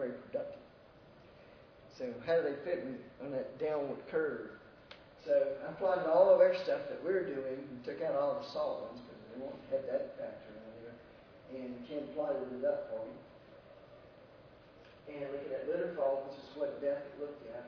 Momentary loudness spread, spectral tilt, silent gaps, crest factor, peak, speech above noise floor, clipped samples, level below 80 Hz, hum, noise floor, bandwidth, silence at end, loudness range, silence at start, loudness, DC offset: 20 LU; -4.5 dB/octave; none; 22 dB; -14 dBFS; 24 dB; under 0.1%; -72 dBFS; none; -59 dBFS; 5.4 kHz; 0 s; 10 LU; 0 s; -36 LUFS; under 0.1%